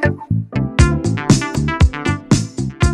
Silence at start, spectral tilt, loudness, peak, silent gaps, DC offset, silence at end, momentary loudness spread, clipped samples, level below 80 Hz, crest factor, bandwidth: 0 s; -5.5 dB/octave; -17 LUFS; 0 dBFS; none; under 0.1%; 0 s; 6 LU; under 0.1%; -22 dBFS; 16 dB; 12 kHz